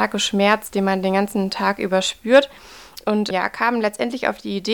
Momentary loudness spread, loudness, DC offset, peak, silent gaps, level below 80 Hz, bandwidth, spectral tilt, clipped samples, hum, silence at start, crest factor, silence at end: 8 LU; -20 LUFS; 0.2%; -4 dBFS; none; -56 dBFS; 19 kHz; -4.5 dB/octave; under 0.1%; none; 0 s; 16 dB; 0 s